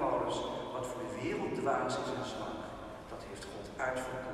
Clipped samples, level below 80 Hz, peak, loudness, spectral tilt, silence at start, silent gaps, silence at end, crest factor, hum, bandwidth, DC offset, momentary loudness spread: under 0.1%; -58 dBFS; -20 dBFS; -38 LUFS; -5 dB/octave; 0 s; none; 0 s; 16 dB; none; 14.5 kHz; under 0.1%; 12 LU